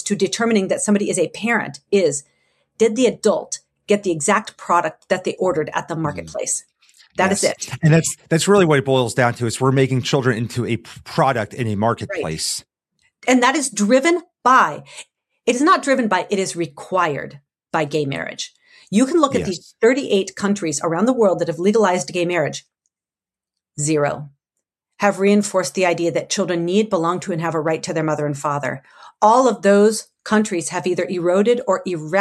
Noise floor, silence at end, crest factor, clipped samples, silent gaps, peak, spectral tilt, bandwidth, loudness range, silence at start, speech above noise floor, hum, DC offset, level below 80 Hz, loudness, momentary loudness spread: under -90 dBFS; 0 s; 18 dB; under 0.1%; none; 0 dBFS; -4.5 dB/octave; 13.5 kHz; 4 LU; 0 s; over 72 dB; none; under 0.1%; -60 dBFS; -19 LUFS; 10 LU